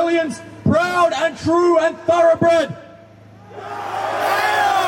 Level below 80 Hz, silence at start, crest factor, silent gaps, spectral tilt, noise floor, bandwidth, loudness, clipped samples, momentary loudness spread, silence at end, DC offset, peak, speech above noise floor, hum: -54 dBFS; 0 s; 14 dB; none; -5 dB/octave; -43 dBFS; 16.5 kHz; -17 LUFS; under 0.1%; 12 LU; 0 s; under 0.1%; -4 dBFS; 26 dB; none